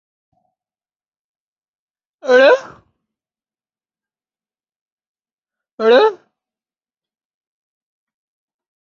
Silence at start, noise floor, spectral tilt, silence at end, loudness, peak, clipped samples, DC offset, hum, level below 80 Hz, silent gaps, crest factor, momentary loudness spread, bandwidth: 2.25 s; under -90 dBFS; -3 dB/octave; 2.75 s; -13 LUFS; -2 dBFS; under 0.1%; under 0.1%; none; -72 dBFS; 4.76-4.86 s, 4.92-4.98 s, 5.07-5.15 s, 5.33-5.42 s, 5.72-5.78 s; 20 dB; 8 LU; 7.2 kHz